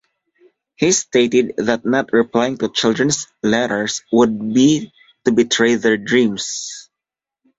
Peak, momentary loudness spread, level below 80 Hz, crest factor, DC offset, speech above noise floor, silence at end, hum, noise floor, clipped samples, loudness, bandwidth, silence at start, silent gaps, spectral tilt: 0 dBFS; 8 LU; -56 dBFS; 18 dB; under 0.1%; 70 dB; 0.75 s; none; -86 dBFS; under 0.1%; -17 LUFS; 8 kHz; 0.8 s; none; -3.5 dB/octave